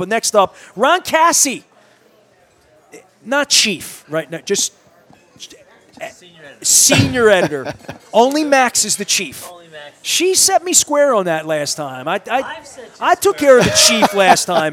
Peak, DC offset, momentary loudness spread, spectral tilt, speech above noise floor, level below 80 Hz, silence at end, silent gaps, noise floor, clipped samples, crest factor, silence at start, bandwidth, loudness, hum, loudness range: 0 dBFS; under 0.1%; 17 LU; -2 dB/octave; 38 dB; -52 dBFS; 0 s; none; -52 dBFS; under 0.1%; 16 dB; 0 s; over 20 kHz; -13 LUFS; none; 5 LU